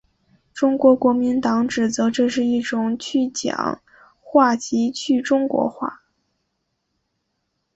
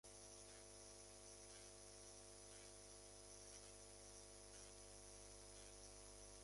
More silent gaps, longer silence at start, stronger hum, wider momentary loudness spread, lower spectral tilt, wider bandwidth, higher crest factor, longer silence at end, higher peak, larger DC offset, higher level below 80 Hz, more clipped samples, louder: neither; first, 0.55 s vs 0.05 s; second, none vs 50 Hz at -70 dBFS; first, 9 LU vs 1 LU; first, -4.5 dB/octave vs -2 dB/octave; second, 8.2 kHz vs 11.5 kHz; about the same, 18 dB vs 18 dB; first, 1.8 s vs 0 s; first, -2 dBFS vs -44 dBFS; neither; first, -60 dBFS vs -70 dBFS; neither; first, -20 LUFS vs -60 LUFS